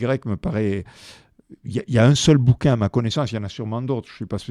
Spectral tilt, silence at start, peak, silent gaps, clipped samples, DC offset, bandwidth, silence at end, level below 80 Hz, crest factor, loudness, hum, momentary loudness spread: -6 dB/octave; 0 s; -2 dBFS; none; under 0.1%; under 0.1%; 11.5 kHz; 0.05 s; -44 dBFS; 20 dB; -21 LUFS; none; 14 LU